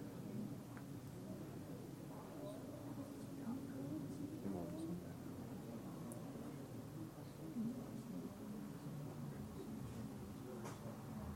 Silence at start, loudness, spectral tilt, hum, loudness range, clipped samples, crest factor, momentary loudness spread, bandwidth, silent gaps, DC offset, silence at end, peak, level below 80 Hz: 0 s; -50 LUFS; -7 dB/octave; none; 2 LU; under 0.1%; 16 dB; 5 LU; 16.5 kHz; none; under 0.1%; 0 s; -34 dBFS; -70 dBFS